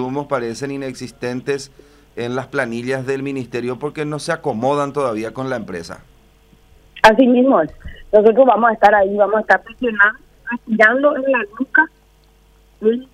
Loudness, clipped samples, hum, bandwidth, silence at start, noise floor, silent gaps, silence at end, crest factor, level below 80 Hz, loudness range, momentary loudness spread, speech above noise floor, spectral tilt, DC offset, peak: -17 LUFS; under 0.1%; none; 15 kHz; 0 s; -52 dBFS; none; 0.1 s; 18 dB; -48 dBFS; 10 LU; 15 LU; 35 dB; -5.5 dB/octave; under 0.1%; 0 dBFS